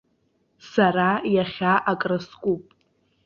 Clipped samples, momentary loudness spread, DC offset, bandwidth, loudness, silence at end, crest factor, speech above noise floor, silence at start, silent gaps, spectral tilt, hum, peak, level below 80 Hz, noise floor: under 0.1%; 8 LU; under 0.1%; 7 kHz; -23 LUFS; 0.65 s; 18 dB; 46 dB; 0.65 s; none; -7 dB/octave; none; -6 dBFS; -62 dBFS; -68 dBFS